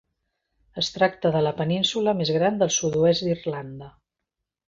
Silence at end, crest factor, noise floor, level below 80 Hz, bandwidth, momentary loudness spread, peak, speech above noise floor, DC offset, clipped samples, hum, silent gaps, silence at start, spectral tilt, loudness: 0.8 s; 18 dB; -84 dBFS; -58 dBFS; 7.8 kHz; 13 LU; -6 dBFS; 61 dB; under 0.1%; under 0.1%; none; none; 0.75 s; -4.5 dB/octave; -23 LUFS